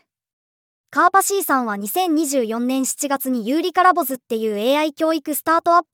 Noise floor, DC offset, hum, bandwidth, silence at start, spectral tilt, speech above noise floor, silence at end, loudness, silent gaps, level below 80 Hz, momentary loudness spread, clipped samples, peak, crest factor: under -90 dBFS; under 0.1%; none; over 20 kHz; 0.9 s; -2.5 dB/octave; over 71 dB; 0.1 s; -19 LUFS; none; -78 dBFS; 6 LU; under 0.1%; -2 dBFS; 18 dB